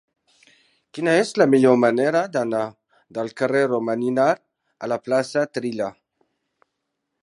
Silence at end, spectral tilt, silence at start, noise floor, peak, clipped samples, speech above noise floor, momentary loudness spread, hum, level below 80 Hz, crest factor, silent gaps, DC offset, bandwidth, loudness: 1.3 s; -6 dB/octave; 0.95 s; -78 dBFS; -2 dBFS; under 0.1%; 58 dB; 14 LU; none; -72 dBFS; 20 dB; none; under 0.1%; 11.5 kHz; -21 LUFS